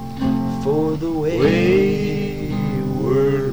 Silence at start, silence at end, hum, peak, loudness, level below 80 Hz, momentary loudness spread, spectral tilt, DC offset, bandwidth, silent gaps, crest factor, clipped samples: 0 s; 0 s; none; -4 dBFS; -19 LUFS; -38 dBFS; 7 LU; -7.5 dB/octave; 1%; over 20 kHz; none; 14 dB; under 0.1%